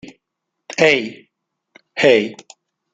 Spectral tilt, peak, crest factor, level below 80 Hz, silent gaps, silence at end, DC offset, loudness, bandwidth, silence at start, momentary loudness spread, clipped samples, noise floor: -4 dB/octave; -2 dBFS; 18 dB; -62 dBFS; none; 0.6 s; under 0.1%; -16 LUFS; 9 kHz; 0.7 s; 16 LU; under 0.1%; -78 dBFS